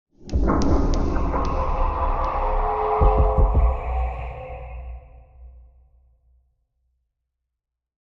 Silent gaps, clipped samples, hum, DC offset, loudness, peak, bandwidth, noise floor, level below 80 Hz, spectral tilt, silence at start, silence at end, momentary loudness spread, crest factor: none; under 0.1%; none; under 0.1%; -23 LUFS; -6 dBFS; 7 kHz; -84 dBFS; -24 dBFS; -8 dB/octave; 0.2 s; 2.4 s; 16 LU; 18 dB